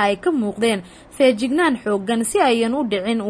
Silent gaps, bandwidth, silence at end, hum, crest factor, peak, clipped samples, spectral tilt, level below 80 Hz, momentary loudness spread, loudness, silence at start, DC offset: none; 11 kHz; 0 s; none; 16 dB; -4 dBFS; under 0.1%; -4 dB/octave; -54 dBFS; 4 LU; -19 LUFS; 0 s; under 0.1%